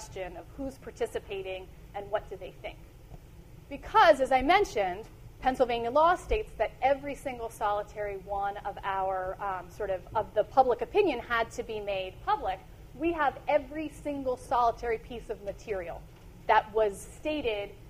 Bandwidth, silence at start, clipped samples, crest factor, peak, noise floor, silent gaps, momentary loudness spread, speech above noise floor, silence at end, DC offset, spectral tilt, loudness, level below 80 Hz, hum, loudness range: 15.5 kHz; 0 s; under 0.1%; 20 dB; -10 dBFS; -50 dBFS; none; 16 LU; 20 dB; 0 s; under 0.1%; -4.5 dB/octave; -30 LUFS; -48 dBFS; none; 7 LU